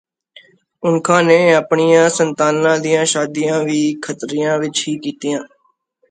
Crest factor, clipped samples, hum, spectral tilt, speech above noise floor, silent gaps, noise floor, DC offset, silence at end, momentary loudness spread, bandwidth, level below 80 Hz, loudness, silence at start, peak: 16 dB; under 0.1%; none; -4 dB/octave; 46 dB; none; -61 dBFS; under 0.1%; 0.65 s; 11 LU; 9.4 kHz; -64 dBFS; -15 LUFS; 0.8 s; 0 dBFS